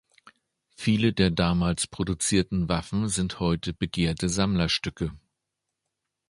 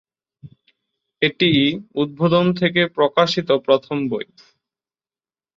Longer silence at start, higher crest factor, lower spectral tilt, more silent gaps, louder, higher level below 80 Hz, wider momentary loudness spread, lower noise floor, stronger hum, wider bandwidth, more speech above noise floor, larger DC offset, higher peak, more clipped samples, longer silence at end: first, 0.8 s vs 0.45 s; about the same, 20 dB vs 18 dB; second, -5 dB/octave vs -6.5 dB/octave; neither; second, -26 LUFS vs -18 LUFS; first, -44 dBFS vs -60 dBFS; second, 6 LU vs 9 LU; second, -83 dBFS vs under -90 dBFS; neither; first, 11.5 kHz vs 7.6 kHz; second, 58 dB vs over 72 dB; neither; second, -6 dBFS vs -2 dBFS; neither; second, 1.1 s vs 1.35 s